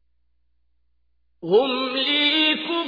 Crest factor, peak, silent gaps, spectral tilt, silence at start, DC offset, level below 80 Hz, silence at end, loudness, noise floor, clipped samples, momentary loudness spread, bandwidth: 18 dB; -6 dBFS; none; -5.5 dB/octave; 1.45 s; under 0.1%; -70 dBFS; 0 s; -19 LUFS; -72 dBFS; under 0.1%; 6 LU; 5 kHz